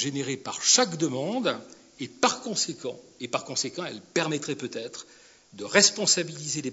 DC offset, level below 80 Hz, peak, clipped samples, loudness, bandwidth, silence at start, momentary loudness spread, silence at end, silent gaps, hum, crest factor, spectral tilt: under 0.1%; -74 dBFS; -4 dBFS; under 0.1%; -25 LUFS; 8.2 kHz; 0 s; 18 LU; 0 s; none; none; 24 dB; -2 dB/octave